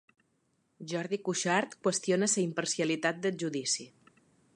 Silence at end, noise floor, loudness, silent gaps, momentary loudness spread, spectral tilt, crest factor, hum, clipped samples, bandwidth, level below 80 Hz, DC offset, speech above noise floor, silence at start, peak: 0.7 s; -75 dBFS; -31 LUFS; none; 6 LU; -3.5 dB/octave; 20 dB; none; under 0.1%; 11.5 kHz; -82 dBFS; under 0.1%; 43 dB; 0.8 s; -14 dBFS